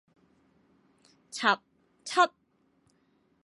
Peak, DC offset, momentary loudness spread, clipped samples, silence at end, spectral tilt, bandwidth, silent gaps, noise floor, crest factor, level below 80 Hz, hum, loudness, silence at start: -8 dBFS; under 0.1%; 16 LU; under 0.1%; 1.15 s; -2 dB/octave; 11.5 kHz; none; -69 dBFS; 24 dB; -86 dBFS; none; -28 LUFS; 1.35 s